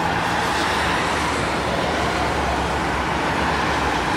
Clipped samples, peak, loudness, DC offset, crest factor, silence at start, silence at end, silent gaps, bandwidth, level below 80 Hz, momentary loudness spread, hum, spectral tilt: under 0.1%; -8 dBFS; -21 LUFS; under 0.1%; 12 dB; 0 s; 0 s; none; 16 kHz; -34 dBFS; 2 LU; none; -4 dB/octave